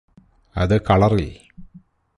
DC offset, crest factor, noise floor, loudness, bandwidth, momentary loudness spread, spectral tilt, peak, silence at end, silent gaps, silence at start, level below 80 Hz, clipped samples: under 0.1%; 18 dB; -50 dBFS; -18 LUFS; 11 kHz; 17 LU; -8 dB/octave; -4 dBFS; 0.4 s; none; 0.55 s; -36 dBFS; under 0.1%